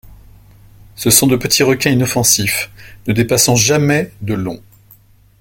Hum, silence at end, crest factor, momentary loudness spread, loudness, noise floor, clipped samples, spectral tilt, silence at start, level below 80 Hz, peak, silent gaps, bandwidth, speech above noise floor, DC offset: none; 0.8 s; 16 dB; 12 LU; -13 LUFS; -47 dBFS; under 0.1%; -3.5 dB/octave; 0.1 s; -42 dBFS; 0 dBFS; none; over 20 kHz; 33 dB; under 0.1%